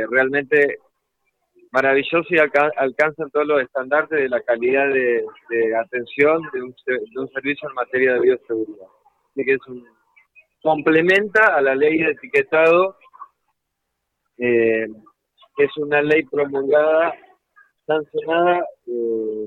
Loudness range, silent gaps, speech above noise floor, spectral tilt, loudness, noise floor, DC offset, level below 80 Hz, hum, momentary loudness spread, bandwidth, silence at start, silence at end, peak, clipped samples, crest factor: 5 LU; none; 58 dB; -6.5 dB/octave; -19 LUFS; -77 dBFS; under 0.1%; -64 dBFS; none; 11 LU; 8 kHz; 0 s; 0 s; -4 dBFS; under 0.1%; 16 dB